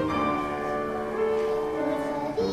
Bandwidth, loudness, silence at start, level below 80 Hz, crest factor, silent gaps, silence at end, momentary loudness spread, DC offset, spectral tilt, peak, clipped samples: 14.5 kHz; -28 LUFS; 0 s; -52 dBFS; 12 dB; none; 0 s; 3 LU; under 0.1%; -6.5 dB/octave; -16 dBFS; under 0.1%